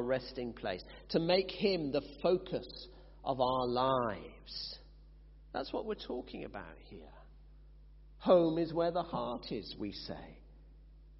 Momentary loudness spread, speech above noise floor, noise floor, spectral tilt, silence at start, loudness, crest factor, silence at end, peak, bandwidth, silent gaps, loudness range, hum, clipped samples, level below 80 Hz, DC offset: 18 LU; 21 dB; -56 dBFS; -4.5 dB/octave; 0 s; -35 LUFS; 22 dB; 0 s; -14 dBFS; 5.8 kHz; none; 10 LU; none; under 0.1%; -56 dBFS; under 0.1%